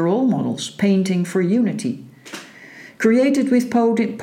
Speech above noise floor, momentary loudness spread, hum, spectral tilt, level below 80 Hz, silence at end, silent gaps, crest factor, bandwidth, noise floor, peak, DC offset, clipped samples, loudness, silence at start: 24 dB; 19 LU; none; -6.5 dB/octave; -68 dBFS; 0 s; none; 14 dB; 14.5 kHz; -42 dBFS; -4 dBFS; under 0.1%; under 0.1%; -18 LUFS; 0 s